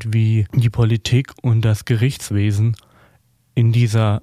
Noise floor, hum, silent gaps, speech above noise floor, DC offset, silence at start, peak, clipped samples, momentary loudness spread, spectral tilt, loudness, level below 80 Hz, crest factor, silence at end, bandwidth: -57 dBFS; none; none; 41 dB; under 0.1%; 0 s; -2 dBFS; under 0.1%; 4 LU; -6.5 dB/octave; -18 LUFS; -44 dBFS; 14 dB; 0.05 s; 13.5 kHz